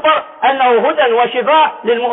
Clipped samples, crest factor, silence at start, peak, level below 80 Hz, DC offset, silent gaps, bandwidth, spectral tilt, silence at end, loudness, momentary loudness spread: under 0.1%; 10 dB; 0 s; -2 dBFS; -64 dBFS; under 0.1%; none; 3.9 kHz; -8.5 dB/octave; 0 s; -12 LUFS; 3 LU